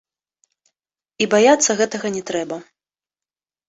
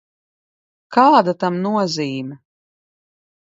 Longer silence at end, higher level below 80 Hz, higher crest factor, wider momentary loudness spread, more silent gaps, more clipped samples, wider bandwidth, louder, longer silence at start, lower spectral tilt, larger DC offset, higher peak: about the same, 1.05 s vs 1.1 s; first, -64 dBFS vs -72 dBFS; about the same, 20 dB vs 20 dB; about the same, 14 LU vs 14 LU; neither; neither; about the same, 8.2 kHz vs 7.8 kHz; about the same, -18 LUFS vs -17 LUFS; first, 1.2 s vs 0.9 s; second, -2.5 dB/octave vs -5.5 dB/octave; neither; about the same, -2 dBFS vs 0 dBFS